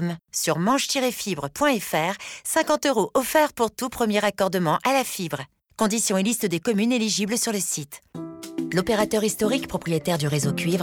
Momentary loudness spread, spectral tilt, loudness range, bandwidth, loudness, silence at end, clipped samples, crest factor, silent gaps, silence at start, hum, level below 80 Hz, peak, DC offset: 9 LU; -4 dB/octave; 2 LU; over 20 kHz; -23 LUFS; 0 s; under 0.1%; 14 dB; none; 0 s; none; -56 dBFS; -8 dBFS; under 0.1%